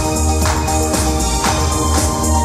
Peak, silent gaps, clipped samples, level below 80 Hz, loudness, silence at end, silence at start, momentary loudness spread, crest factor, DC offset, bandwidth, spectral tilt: -2 dBFS; none; under 0.1%; -20 dBFS; -16 LUFS; 0 s; 0 s; 1 LU; 12 dB; under 0.1%; 15.5 kHz; -4 dB/octave